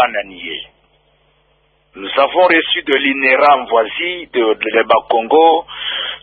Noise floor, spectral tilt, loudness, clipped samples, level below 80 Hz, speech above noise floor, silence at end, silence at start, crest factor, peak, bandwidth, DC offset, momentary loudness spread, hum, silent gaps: -58 dBFS; -5.5 dB/octave; -13 LUFS; under 0.1%; -56 dBFS; 44 dB; 0.05 s; 0 s; 14 dB; 0 dBFS; 4.7 kHz; under 0.1%; 13 LU; none; none